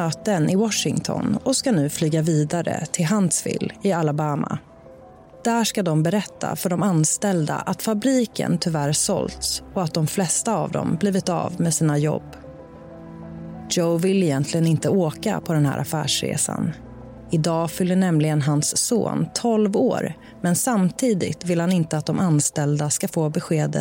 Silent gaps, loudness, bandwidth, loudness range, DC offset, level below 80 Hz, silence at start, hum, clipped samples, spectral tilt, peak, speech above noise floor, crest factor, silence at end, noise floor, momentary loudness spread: none; -22 LUFS; 17 kHz; 2 LU; under 0.1%; -54 dBFS; 0 s; none; under 0.1%; -5 dB/octave; -8 dBFS; 24 dB; 14 dB; 0 s; -45 dBFS; 8 LU